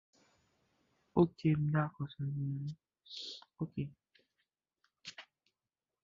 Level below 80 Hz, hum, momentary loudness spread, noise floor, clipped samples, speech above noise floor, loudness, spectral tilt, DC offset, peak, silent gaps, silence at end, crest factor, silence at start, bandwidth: -68 dBFS; none; 19 LU; under -90 dBFS; under 0.1%; over 54 dB; -37 LUFS; -7 dB/octave; under 0.1%; -16 dBFS; none; 0.8 s; 24 dB; 1.15 s; 7.4 kHz